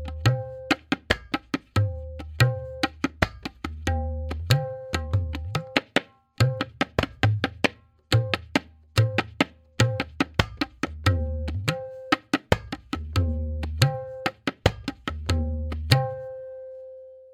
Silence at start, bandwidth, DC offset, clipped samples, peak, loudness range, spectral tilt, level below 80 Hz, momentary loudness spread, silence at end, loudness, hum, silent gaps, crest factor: 0 s; 16 kHz; under 0.1%; under 0.1%; 0 dBFS; 2 LU; -5.5 dB/octave; -40 dBFS; 10 LU; 0.05 s; -27 LUFS; none; none; 26 dB